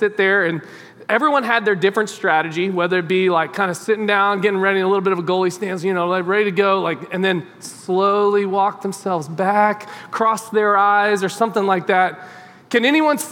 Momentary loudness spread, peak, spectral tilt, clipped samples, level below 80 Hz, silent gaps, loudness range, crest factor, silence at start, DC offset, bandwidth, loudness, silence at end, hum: 7 LU; -2 dBFS; -5 dB/octave; under 0.1%; -78 dBFS; none; 2 LU; 16 dB; 0 s; under 0.1%; 16.5 kHz; -18 LUFS; 0 s; none